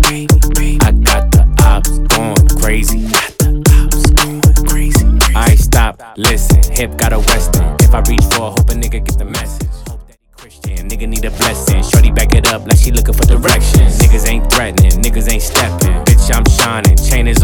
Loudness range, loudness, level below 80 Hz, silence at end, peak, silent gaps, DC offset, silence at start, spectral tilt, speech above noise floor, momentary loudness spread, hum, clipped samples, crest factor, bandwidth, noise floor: 5 LU; -11 LUFS; -10 dBFS; 0 s; 0 dBFS; none; under 0.1%; 0 s; -4.5 dB/octave; 31 dB; 8 LU; none; under 0.1%; 10 dB; 19 kHz; -40 dBFS